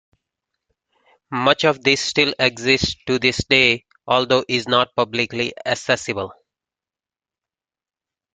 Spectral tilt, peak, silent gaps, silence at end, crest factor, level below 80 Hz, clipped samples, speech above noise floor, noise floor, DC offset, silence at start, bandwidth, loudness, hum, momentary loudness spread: -3.5 dB/octave; 0 dBFS; none; 2 s; 22 dB; -50 dBFS; under 0.1%; over 71 dB; under -90 dBFS; under 0.1%; 1.3 s; 9.4 kHz; -18 LUFS; none; 9 LU